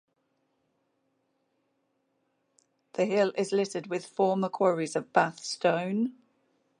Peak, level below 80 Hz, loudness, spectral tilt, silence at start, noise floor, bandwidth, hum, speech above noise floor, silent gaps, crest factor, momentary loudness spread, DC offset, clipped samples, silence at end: -8 dBFS; -82 dBFS; -28 LUFS; -5 dB/octave; 3 s; -76 dBFS; 11 kHz; none; 48 dB; none; 24 dB; 7 LU; under 0.1%; under 0.1%; 0.7 s